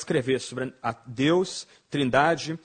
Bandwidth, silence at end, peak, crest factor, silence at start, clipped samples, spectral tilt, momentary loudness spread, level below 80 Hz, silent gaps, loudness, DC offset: 9.4 kHz; 0.05 s; -6 dBFS; 20 dB; 0 s; under 0.1%; -5 dB/octave; 11 LU; -60 dBFS; none; -26 LUFS; under 0.1%